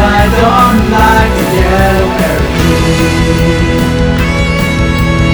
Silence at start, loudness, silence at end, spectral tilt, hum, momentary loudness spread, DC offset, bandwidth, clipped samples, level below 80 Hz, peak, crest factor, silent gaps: 0 s; -9 LUFS; 0 s; -6 dB/octave; none; 4 LU; 0.6%; over 20 kHz; 0.3%; -16 dBFS; 0 dBFS; 8 dB; none